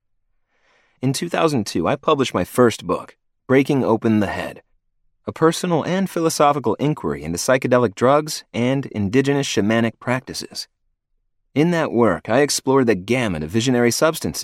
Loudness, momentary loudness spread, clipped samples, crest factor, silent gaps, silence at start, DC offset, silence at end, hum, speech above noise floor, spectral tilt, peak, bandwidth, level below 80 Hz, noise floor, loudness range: -19 LUFS; 9 LU; under 0.1%; 16 dB; none; 1 s; under 0.1%; 0 s; none; 50 dB; -5 dB/octave; -4 dBFS; 16 kHz; -52 dBFS; -69 dBFS; 2 LU